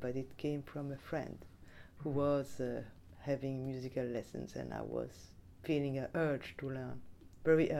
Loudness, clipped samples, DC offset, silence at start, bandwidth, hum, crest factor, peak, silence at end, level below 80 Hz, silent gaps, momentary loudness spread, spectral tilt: -39 LUFS; under 0.1%; under 0.1%; 0 s; 15.5 kHz; none; 20 dB; -18 dBFS; 0 s; -62 dBFS; none; 18 LU; -7.5 dB/octave